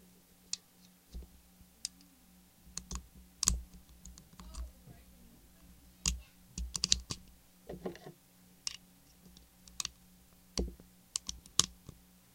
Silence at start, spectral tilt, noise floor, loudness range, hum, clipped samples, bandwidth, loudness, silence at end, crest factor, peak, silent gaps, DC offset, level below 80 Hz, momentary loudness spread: 0.55 s; -1.5 dB/octave; -63 dBFS; 7 LU; none; under 0.1%; 16.5 kHz; -38 LUFS; 0.4 s; 42 dB; -2 dBFS; none; under 0.1%; -50 dBFS; 27 LU